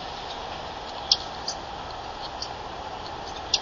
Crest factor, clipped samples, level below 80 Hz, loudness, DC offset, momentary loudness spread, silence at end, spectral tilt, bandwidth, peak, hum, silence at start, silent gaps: 28 dB; under 0.1%; -48 dBFS; -30 LUFS; under 0.1%; 12 LU; 0 s; -1.5 dB/octave; 7.4 kHz; -4 dBFS; none; 0 s; none